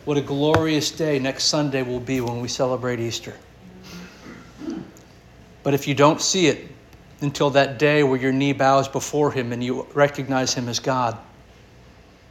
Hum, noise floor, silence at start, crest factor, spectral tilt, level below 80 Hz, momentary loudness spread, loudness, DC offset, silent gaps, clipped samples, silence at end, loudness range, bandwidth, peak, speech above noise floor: none; -48 dBFS; 0.05 s; 22 dB; -4.5 dB/octave; -52 dBFS; 18 LU; -21 LUFS; under 0.1%; none; under 0.1%; 1.05 s; 8 LU; 17 kHz; -2 dBFS; 28 dB